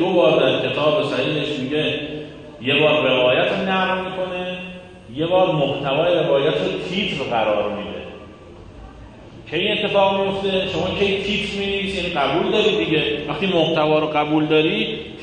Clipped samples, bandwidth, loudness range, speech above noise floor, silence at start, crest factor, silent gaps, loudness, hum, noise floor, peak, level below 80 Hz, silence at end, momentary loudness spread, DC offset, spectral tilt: under 0.1%; 9.6 kHz; 4 LU; 21 dB; 0 s; 16 dB; none; -19 LUFS; none; -40 dBFS; -4 dBFS; -48 dBFS; 0 s; 11 LU; under 0.1%; -6 dB/octave